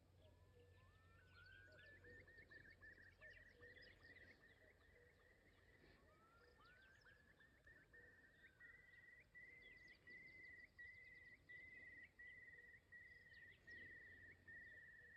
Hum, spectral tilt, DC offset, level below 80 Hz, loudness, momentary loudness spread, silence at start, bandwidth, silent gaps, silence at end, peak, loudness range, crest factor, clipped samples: none; -4.5 dB/octave; under 0.1%; -82 dBFS; -63 LUFS; 7 LU; 0 s; 8.2 kHz; none; 0 s; -52 dBFS; 7 LU; 14 dB; under 0.1%